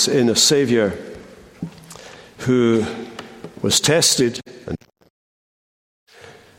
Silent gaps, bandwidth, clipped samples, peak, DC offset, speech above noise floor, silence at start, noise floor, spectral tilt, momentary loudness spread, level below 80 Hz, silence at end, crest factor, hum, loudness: 5.10-6.07 s; 16.5 kHz; under 0.1%; -2 dBFS; under 0.1%; 28 dB; 0 s; -45 dBFS; -3 dB/octave; 23 LU; -54 dBFS; 0.3 s; 20 dB; none; -17 LUFS